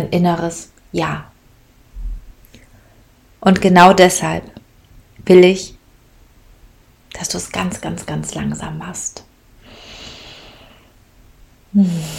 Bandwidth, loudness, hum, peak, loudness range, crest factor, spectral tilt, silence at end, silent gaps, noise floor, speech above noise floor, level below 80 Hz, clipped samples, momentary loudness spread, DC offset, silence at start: 16 kHz; -15 LUFS; none; 0 dBFS; 15 LU; 18 dB; -5 dB/octave; 0 s; none; -49 dBFS; 35 dB; -40 dBFS; 0.2%; 25 LU; under 0.1%; 0 s